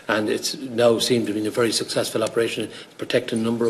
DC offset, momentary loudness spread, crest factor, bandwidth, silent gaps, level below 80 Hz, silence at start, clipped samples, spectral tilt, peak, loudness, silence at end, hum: under 0.1%; 7 LU; 18 dB; 14 kHz; none; -62 dBFS; 0.05 s; under 0.1%; -4 dB/octave; -4 dBFS; -22 LUFS; 0 s; none